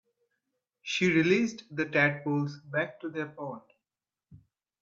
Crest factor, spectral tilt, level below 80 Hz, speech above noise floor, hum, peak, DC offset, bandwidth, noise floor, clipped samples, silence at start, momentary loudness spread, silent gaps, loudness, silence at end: 22 dB; -5.5 dB/octave; -72 dBFS; over 61 dB; none; -10 dBFS; under 0.1%; 7.8 kHz; under -90 dBFS; under 0.1%; 0.85 s; 16 LU; none; -29 LUFS; 0.45 s